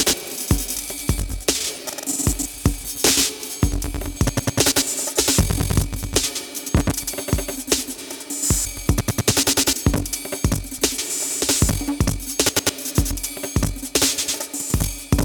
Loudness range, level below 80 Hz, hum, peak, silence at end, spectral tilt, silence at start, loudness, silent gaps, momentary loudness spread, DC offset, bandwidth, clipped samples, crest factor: 2 LU; -30 dBFS; none; -2 dBFS; 0 s; -3 dB/octave; 0 s; -21 LUFS; none; 7 LU; under 0.1%; 19.5 kHz; under 0.1%; 20 dB